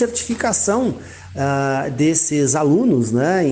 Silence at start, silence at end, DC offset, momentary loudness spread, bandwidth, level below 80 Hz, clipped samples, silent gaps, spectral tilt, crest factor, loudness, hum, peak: 0 s; 0 s; under 0.1%; 8 LU; 10 kHz; -50 dBFS; under 0.1%; none; -5 dB/octave; 12 dB; -18 LUFS; none; -6 dBFS